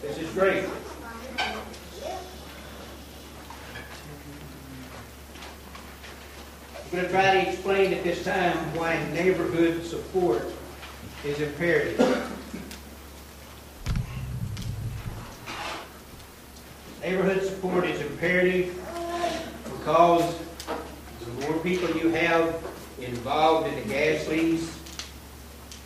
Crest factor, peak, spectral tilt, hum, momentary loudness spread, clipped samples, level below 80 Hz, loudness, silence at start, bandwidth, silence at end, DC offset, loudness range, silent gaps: 24 dB; -4 dBFS; -5.5 dB/octave; none; 20 LU; under 0.1%; -46 dBFS; -26 LUFS; 0 s; 15.5 kHz; 0 s; under 0.1%; 15 LU; none